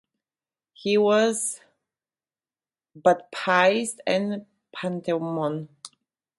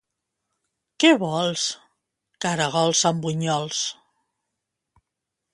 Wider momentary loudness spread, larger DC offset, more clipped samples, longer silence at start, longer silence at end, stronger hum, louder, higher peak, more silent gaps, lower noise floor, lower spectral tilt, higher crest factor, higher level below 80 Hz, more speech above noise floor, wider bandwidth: first, 19 LU vs 10 LU; neither; neither; second, 0.8 s vs 1 s; second, 0.5 s vs 1.6 s; neither; about the same, -24 LUFS vs -22 LUFS; about the same, -4 dBFS vs -2 dBFS; neither; first, under -90 dBFS vs -83 dBFS; about the same, -4 dB/octave vs -3.5 dB/octave; about the same, 22 dB vs 22 dB; second, -74 dBFS vs -68 dBFS; first, over 67 dB vs 61 dB; about the same, 12 kHz vs 11.5 kHz